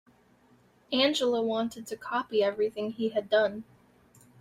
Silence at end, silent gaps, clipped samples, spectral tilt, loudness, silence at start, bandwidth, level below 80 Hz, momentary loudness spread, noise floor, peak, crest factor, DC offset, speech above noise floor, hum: 0.8 s; none; under 0.1%; -4 dB/octave; -29 LUFS; 0.9 s; 15.5 kHz; -72 dBFS; 8 LU; -63 dBFS; -12 dBFS; 18 dB; under 0.1%; 34 dB; none